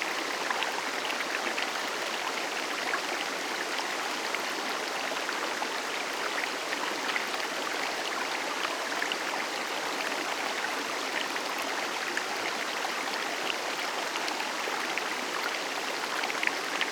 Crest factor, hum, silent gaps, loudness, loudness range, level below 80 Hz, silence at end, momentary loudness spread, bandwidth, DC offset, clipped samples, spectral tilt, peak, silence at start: 22 dB; none; none; -31 LUFS; 0 LU; -78 dBFS; 0 s; 2 LU; over 20 kHz; under 0.1%; under 0.1%; -0.5 dB/octave; -10 dBFS; 0 s